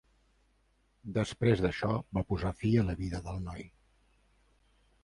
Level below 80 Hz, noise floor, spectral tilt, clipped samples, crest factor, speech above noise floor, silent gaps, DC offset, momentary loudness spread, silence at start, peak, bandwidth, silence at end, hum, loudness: -48 dBFS; -71 dBFS; -7.5 dB/octave; under 0.1%; 20 dB; 40 dB; none; under 0.1%; 12 LU; 1.05 s; -14 dBFS; 11 kHz; 1.35 s; none; -32 LUFS